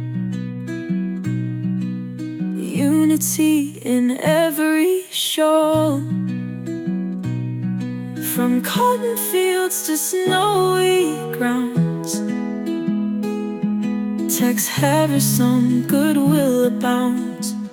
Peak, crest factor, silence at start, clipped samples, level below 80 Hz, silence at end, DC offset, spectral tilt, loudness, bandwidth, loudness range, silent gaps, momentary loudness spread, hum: -4 dBFS; 14 dB; 0 s; under 0.1%; -62 dBFS; 0 s; under 0.1%; -5 dB/octave; -19 LUFS; 19 kHz; 4 LU; none; 9 LU; none